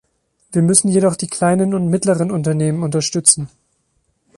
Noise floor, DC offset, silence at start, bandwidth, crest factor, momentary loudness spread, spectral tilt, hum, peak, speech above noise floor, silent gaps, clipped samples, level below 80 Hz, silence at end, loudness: -65 dBFS; under 0.1%; 0.5 s; 11.5 kHz; 18 dB; 6 LU; -5 dB/octave; none; 0 dBFS; 49 dB; none; under 0.1%; -54 dBFS; 0.9 s; -15 LUFS